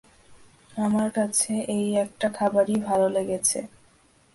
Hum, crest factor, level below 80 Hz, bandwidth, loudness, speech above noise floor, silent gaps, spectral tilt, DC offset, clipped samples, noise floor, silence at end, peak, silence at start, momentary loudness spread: none; 16 dB; -62 dBFS; 12 kHz; -24 LUFS; 35 dB; none; -4 dB/octave; under 0.1%; under 0.1%; -59 dBFS; 0.65 s; -10 dBFS; 0.3 s; 6 LU